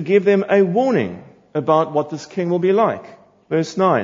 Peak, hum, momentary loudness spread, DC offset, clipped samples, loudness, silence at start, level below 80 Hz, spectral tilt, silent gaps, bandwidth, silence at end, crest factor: -2 dBFS; none; 12 LU; under 0.1%; under 0.1%; -18 LUFS; 0 s; -66 dBFS; -7 dB/octave; none; 7.6 kHz; 0 s; 16 dB